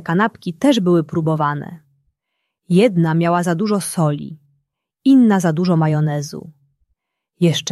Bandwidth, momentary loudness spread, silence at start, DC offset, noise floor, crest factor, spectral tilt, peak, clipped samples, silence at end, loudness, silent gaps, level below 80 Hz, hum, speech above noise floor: 13 kHz; 13 LU; 0 s; under 0.1%; -76 dBFS; 16 dB; -6.5 dB/octave; -2 dBFS; under 0.1%; 0 s; -17 LUFS; none; -62 dBFS; none; 60 dB